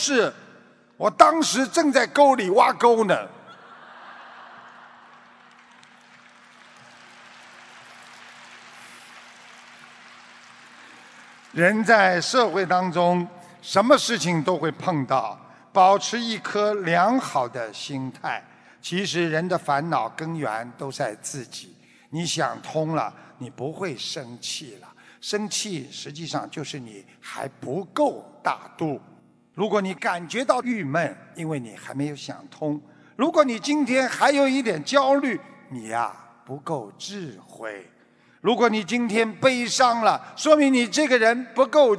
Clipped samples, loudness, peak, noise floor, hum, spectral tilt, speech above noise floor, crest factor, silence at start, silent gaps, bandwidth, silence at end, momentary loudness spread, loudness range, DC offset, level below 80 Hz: under 0.1%; -22 LUFS; 0 dBFS; -57 dBFS; none; -4 dB/octave; 35 dB; 24 dB; 0 s; none; 11 kHz; 0 s; 21 LU; 11 LU; under 0.1%; -74 dBFS